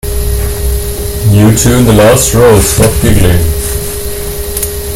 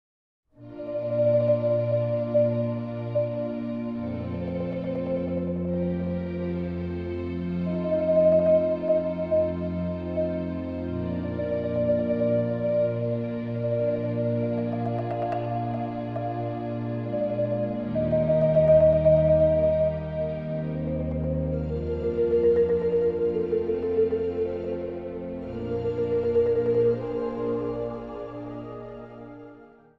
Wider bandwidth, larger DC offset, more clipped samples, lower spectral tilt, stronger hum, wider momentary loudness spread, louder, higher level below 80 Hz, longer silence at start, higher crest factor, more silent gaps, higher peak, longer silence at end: first, 17 kHz vs 5 kHz; neither; first, 2% vs under 0.1%; second, -5 dB/octave vs -11 dB/octave; neither; about the same, 11 LU vs 11 LU; first, -9 LUFS vs -26 LUFS; first, -16 dBFS vs -46 dBFS; second, 0.05 s vs 0.6 s; second, 8 dB vs 16 dB; neither; first, 0 dBFS vs -8 dBFS; second, 0 s vs 0.3 s